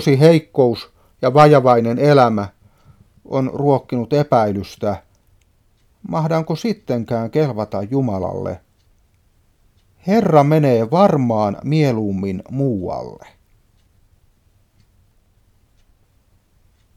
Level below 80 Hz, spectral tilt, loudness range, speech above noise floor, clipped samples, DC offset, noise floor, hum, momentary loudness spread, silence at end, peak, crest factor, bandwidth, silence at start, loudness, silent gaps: -54 dBFS; -8 dB/octave; 8 LU; 42 dB; under 0.1%; under 0.1%; -57 dBFS; none; 14 LU; 3.8 s; 0 dBFS; 18 dB; 14.5 kHz; 0 s; -17 LUFS; none